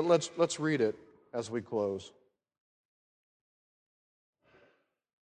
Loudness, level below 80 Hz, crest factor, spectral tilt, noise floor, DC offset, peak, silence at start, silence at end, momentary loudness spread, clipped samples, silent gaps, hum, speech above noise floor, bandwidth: -33 LUFS; -74 dBFS; 22 dB; -5 dB/octave; -70 dBFS; under 0.1%; -14 dBFS; 0 s; 3.2 s; 14 LU; under 0.1%; none; none; 39 dB; 10 kHz